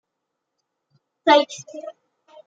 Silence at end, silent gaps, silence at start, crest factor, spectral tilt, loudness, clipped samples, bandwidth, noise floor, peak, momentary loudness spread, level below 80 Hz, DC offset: 0.55 s; none; 1.25 s; 22 dB; -2.5 dB/octave; -19 LUFS; under 0.1%; 8 kHz; -80 dBFS; -2 dBFS; 21 LU; -86 dBFS; under 0.1%